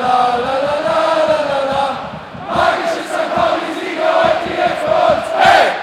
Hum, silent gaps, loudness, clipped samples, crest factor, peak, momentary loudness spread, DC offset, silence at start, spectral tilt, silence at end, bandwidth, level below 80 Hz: none; none; -15 LUFS; under 0.1%; 14 dB; 0 dBFS; 8 LU; under 0.1%; 0 s; -4 dB/octave; 0 s; 14 kHz; -48 dBFS